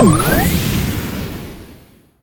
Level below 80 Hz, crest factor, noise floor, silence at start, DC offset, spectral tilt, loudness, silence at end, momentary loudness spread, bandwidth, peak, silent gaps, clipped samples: -28 dBFS; 16 dB; -45 dBFS; 0 s; under 0.1%; -5.5 dB/octave; -17 LUFS; 0.5 s; 19 LU; 18 kHz; 0 dBFS; none; under 0.1%